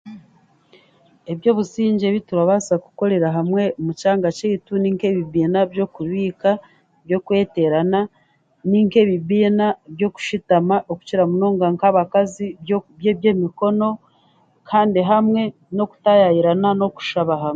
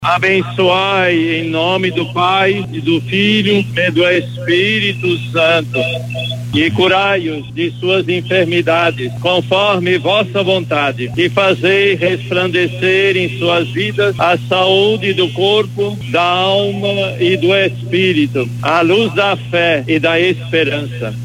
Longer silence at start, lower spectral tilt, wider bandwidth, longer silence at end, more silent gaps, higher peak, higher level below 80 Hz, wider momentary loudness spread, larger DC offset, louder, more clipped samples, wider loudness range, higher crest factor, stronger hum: about the same, 0.05 s vs 0 s; about the same, -7 dB/octave vs -6 dB/octave; second, 7.8 kHz vs 15.5 kHz; about the same, 0 s vs 0 s; neither; about the same, -2 dBFS vs 0 dBFS; second, -60 dBFS vs -48 dBFS; first, 8 LU vs 5 LU; neither; second, -19 LUFS vs -13 LUFS; neither; about the same, 3 LU vs 1 LU; about the same, 16 dB vs 14 dB; second, none vs 60 Hz at -30 dBFS